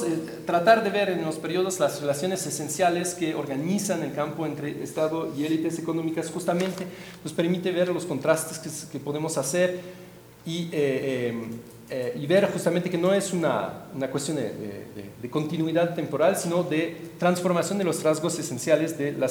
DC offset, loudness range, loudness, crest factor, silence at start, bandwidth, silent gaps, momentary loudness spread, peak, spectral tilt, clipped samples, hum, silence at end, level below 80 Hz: under 0.1%; 3 LU; -26 LUFS; 20 dB; 0 s; over 20 kHz; none; 11 LU; -6 dBFS; -5 dB/octave; under 0.1%; none; 0 s; -66 dBFS